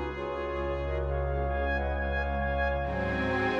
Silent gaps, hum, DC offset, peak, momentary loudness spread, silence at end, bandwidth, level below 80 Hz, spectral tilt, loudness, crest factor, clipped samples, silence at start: none; none; under 0.1%; -16 dBFS; 4 LU; 0 s; 6.6 kHz; -34 dBFS; -8 dB/octave; -31 LUFS; 14 dB; under 0.1%; 0 s